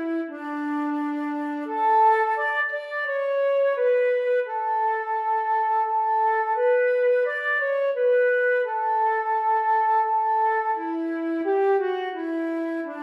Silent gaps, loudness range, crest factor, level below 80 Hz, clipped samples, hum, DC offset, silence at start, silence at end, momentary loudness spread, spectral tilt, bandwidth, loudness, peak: none; 2 LU; 12 dB; under -90 dBFS; under 0.1%; none; under 0.1%; 0 s; 0 s; 7 LU; -4 dB/octave; 5.6 kHz; -23 LUFS; -10 dBFS